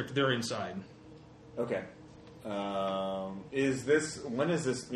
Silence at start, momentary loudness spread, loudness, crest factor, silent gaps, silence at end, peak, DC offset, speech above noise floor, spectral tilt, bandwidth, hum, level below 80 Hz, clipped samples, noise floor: 0 s; 22 LU; -33 LUFS; 20 dB; none; 0 s; -14 dBFS; under 0.1%; 20 dB; -5 dB/octave; 12 kHz; none; -66 dBFS; under 0.1%; -53 dBFS